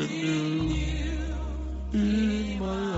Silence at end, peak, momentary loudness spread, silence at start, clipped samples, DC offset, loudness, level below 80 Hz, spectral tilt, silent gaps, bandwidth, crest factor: 0 s; -16 dBFS; 8 LU; 0 s; under 0.1%; under 0.1%; -29 LUFS; -34 dBFS; -6 dB/octave; none; 8 kHz; 12 dB